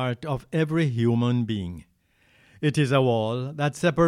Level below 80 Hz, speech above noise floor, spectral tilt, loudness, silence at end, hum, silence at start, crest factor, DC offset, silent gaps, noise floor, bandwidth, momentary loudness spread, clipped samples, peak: -54 dBFS; 39 dB; -7 dB/octave; -25 LUFS; 0 s; none; 0 s; 16 dB; under 0.1%; none; -63 dBFS; 12 kHz; 9 LU; under 0.1%; -8 dBFS